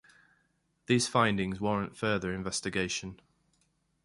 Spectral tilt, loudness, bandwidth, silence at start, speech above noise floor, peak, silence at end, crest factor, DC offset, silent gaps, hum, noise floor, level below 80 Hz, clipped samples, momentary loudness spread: -4.5 dB/octave; -30 LUFS; 11.5 kHz; 0.9 s; 43 dB; -12 dBFS; 0.9 s; 22 dB; under 0.1%; none; none; -74 dBFS; -58 dBFS; under 0.1%; 7 LU